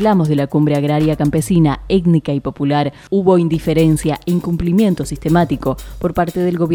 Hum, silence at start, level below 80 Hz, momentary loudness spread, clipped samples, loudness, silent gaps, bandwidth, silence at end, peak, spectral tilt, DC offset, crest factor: none; 0 s; -34 dBFS; 5 LU; under 0.1%; -16 LUFS; none; 18.5 kHz; 0 s; 0 dBFS; -7.5 dB/octave; under 0.1%; 14 dB